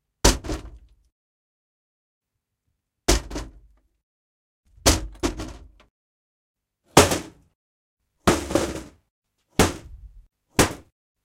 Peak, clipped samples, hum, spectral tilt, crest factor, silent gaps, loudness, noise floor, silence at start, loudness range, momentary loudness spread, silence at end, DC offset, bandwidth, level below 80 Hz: 0 dBFS; under 0.1%; none; -3.5 dB/octave; 26 dB; 1.12-2.21 s, 4.03-4.63 s, 5.90-6.54 s, 7.55-7.97 s, 9.10-9.22 s; -22 LUFS; -78 dBFS; 0.25 s; 8 LU; 19 LU; 0.45 s; under 0.1%; 16.5 kHz; -36 dBFS